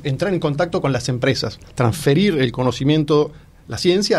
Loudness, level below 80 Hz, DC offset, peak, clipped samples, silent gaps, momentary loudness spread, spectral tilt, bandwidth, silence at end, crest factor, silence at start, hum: -19 LUFS; -44 dBFS; under 0.1%; -4 dBFS; under 0.1%; none; 6 LU; -6 dB/octave; 14.5 kHz; 0 s; 14 dB; 0 s; none